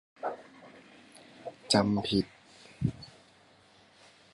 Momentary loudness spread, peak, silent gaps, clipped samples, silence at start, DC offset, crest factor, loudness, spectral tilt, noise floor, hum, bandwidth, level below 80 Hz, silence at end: 27 LU; -10 dBFS; none; under 0.1%; 0.2 s; under 0.1%; 24 dB; -31 LUFS; -5 dB/octave; -61 dBFS; none; 11.5 kHz; -58 dBFS; 1.25 s